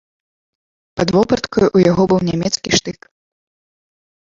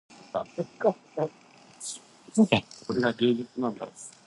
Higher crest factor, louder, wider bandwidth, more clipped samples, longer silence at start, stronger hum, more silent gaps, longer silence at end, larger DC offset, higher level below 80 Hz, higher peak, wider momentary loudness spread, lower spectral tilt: second, 18 dB vs 24 dB; first, -15 LUFS vs -28 LUFS; second, 7.6 kHz vs 11.5 kHz; neither; first, 0.95 s vs 0.35 s; neither; neither; first, 1.4 s vs 0.15 s; neither; first, -44 dBFS vs -66 dBFS; first, 0 dBFS vs -6 dBFS; second, 8 LU vs 15 LU; about the same, -5 dB/octave vs -5 dB/octave